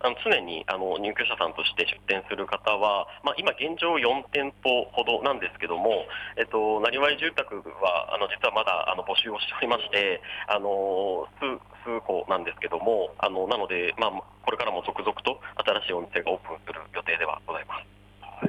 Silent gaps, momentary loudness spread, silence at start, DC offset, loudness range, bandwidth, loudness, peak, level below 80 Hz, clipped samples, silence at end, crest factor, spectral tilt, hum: none; 8 LU; 0 s; under 0.1%; 3 LU; 11.5 kHz; -27 LUFS; -10 dBFS; -60 dBFS; under 0.1%; 0 s; 18 dB; -4.5 dB/octave; 50 Hz at -55 dBFS